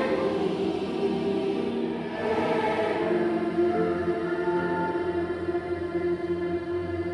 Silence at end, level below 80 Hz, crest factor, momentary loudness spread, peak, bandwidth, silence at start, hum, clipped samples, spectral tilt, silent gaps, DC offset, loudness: 0 s; -56 dBFS; 14 dB; 5 LU; -14 dBFS; 10.5 kHz; 0 s; none; under 0.1%; -7.5 dB/octave; none; under 0.1%; -27 LUFS